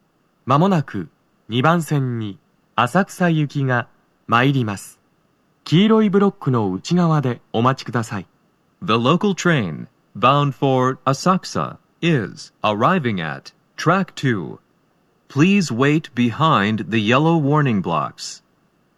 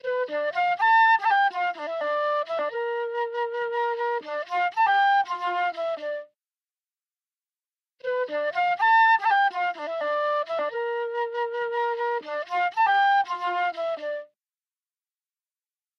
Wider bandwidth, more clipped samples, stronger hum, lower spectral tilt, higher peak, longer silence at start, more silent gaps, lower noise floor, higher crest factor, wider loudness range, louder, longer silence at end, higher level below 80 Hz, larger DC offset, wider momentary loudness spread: first, 13 kHz vs 6.8 kHz; neither; neither; first, -6.5 dB/octave vs -2 dB/octave; first, 0 dBFS vs -12 dBFS; first, 0.45 s vs 0.05 s; neither; second, -62 dBFS vs under -90 dBFS; about the same, 18 dB vs 14 dB; about the same, 3 LU vs 4 LU; first, -19 LUFS vs -24 LUFS; second, 0.6 s vs 1.75 s; first, -64 dBFS vs under -90 dBFS; neither; first, 15 LU vs 11 LU